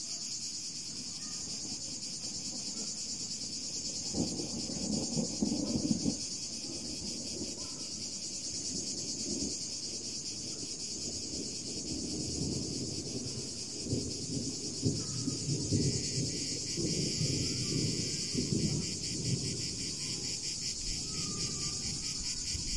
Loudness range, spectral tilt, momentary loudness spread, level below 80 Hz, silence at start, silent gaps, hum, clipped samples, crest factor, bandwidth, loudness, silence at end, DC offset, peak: 4 LU; -3 dB/octave; 5 LU; -56 dBFS; 0 s; none; none; under 0.1%; 20 dB; 11.5 kHz; -35 LUFS; 0 s; 0.2%; -16 dBFS